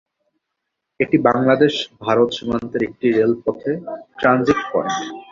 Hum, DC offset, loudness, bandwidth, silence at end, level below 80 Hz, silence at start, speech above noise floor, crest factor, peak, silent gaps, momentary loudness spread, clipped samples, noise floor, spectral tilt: none; under 0.1%; -19 LUFS; 7.6 kHz; 0.1 s; -52 dBFS; 1 s; 60 dB; 18 dB; -2 dBFS; none; 9 LU; under 0.1%; -78 dBFS; -6 dB/octave